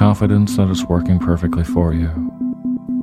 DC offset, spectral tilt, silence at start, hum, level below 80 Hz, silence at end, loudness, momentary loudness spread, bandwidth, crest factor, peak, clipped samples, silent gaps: under 0.1%; -7.5 dB/octave; 0 s; none; -30 dBFS; 0 s; -17 LUFS; 8 LU; 14.5 kHz; 16 dB; 0 dBFS; under 0.1%; none